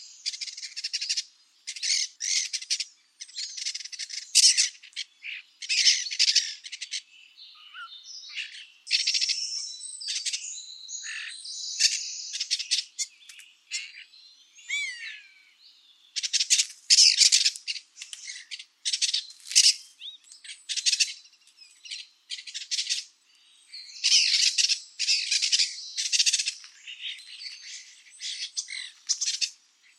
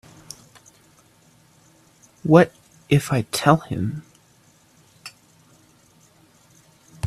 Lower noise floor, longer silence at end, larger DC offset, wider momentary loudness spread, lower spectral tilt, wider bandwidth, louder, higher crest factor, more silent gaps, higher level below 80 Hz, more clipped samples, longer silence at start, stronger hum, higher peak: first, -60 dBFS vs -56 dBFS; first, 0.45 s vs 0 s; neither; second, 22 LU vs 26 LU; second, 11 dB/octave vs -6 dB/octave; first, 16 kHz vs 14.5 kHz; second, -24 LUFS vs -20 LUFS; about the same, 28 dB vs 24 dB; neither; second, under -90 dBFS vs -56 dBFS; neither; second, 0 s vs 2.25 s; neither; about the same, -2 dBFS vs 0 dBFS